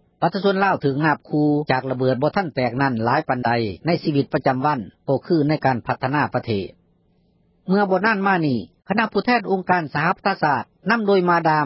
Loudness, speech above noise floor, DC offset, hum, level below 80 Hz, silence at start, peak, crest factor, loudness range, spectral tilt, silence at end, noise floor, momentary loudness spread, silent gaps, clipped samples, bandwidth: -20 LUFS; 41 dB; under 0.1%; none; -56 dBFS; 0.2 s; -2 dBFS; 18 dB; 2 LU; -11 dB/octave; 0 s; -61 dBFS; 6 LU; none; under 0.1%; 5.8 kHz